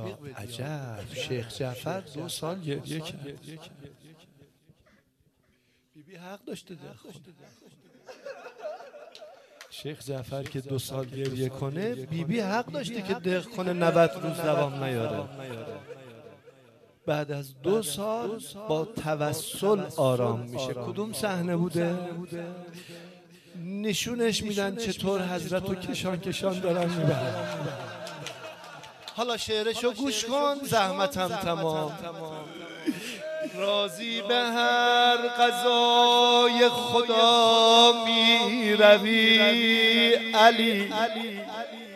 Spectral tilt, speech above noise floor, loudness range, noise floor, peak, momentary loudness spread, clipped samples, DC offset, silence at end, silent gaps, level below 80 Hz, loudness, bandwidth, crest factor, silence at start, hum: -4 dB/octave; 42 dB; 19 LU; -68 dBFS; -4 dBFS; 22 LU; under 0.1%; under 0.1%; 0 s; none; -64 dBFS; -25 LUFS; 14 kHz; 22 dB; 0 s; none